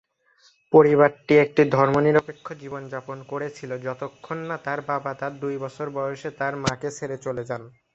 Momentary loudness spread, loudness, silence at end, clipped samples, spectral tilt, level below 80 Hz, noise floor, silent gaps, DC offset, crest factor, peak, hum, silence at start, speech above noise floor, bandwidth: 17 LU; -23 LUFS; 0.25 s; under 0.1%; -6.5 dB/octave; -60 dBFS; -60 dBFS; none; under 0.1%; 20 dB; -2 dBFS; none; 0.7 s; 37 dB; 8 kHz